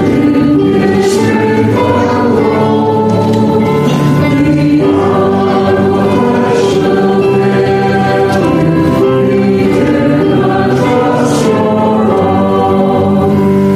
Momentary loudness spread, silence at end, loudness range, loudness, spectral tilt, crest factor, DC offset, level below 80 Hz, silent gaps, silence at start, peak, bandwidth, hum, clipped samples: 1 LU; 0 s; 0 LU; -10 LUFS; -7 dB/octave; 8 dB; under 0.1%; -38 dBFS; none; 0 s; 0 dBFS; 14.5 kHz; none; under 0.1%